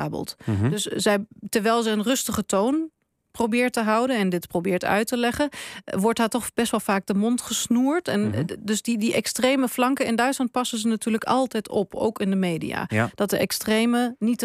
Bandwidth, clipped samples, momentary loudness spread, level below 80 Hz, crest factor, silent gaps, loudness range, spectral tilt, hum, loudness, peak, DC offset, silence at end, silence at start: 15.5 kHz; under 0.1%; 5 LU; -58 dBFS; 16 dB; none; 1 LU; -4.5 dB/octave; none; -23 LUFS; -8 dBFS; under 0.1%; 0 s; 0 s